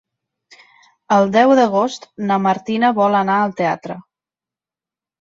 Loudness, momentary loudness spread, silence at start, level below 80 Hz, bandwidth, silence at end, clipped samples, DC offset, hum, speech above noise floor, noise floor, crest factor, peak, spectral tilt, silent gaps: -16 LUFS; 13 LU; 1.1 s; -64 dBFS; 7.8 kHz; 1.2 s; under 0.1%; under 0.1%; none; 74 dB; -89 dBFS; 16 dB; -2 dBFS; -6 dB/octave; none